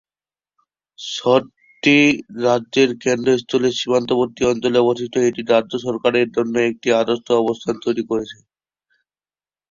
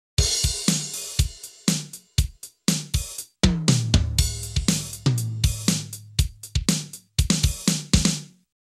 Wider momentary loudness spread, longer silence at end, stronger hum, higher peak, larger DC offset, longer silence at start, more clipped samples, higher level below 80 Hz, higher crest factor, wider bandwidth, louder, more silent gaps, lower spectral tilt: about the same, 7 LU vs 7 LU; first, 1.4 s vs 0.4 s; neither; about the same, -2 dBFS vs -4 dBFS; neither; first, 1 s vs 0.2 s; neither; second, -56 dBFS vs -30 dBFS; about the same, 18 dB vs 20 dB; second, 7.6 kHz vs 15 kHz; first, -18 LUFS vs -24 LUFS; neither; about the same, -4.5 dB/octave vs -3.5 dB/octave